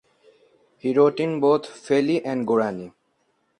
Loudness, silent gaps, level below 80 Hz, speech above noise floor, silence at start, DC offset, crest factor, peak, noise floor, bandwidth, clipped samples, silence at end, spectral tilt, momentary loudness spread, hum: -22 LUFS; none; -70 dBFS; 48 dB; 0.85 s; under 0.1%; 18 dB; -6 dBFS; -69 dBFS; 10 kHz; under 0.1%; 0.7 s; -6.5 dB/octave; 10 LU; none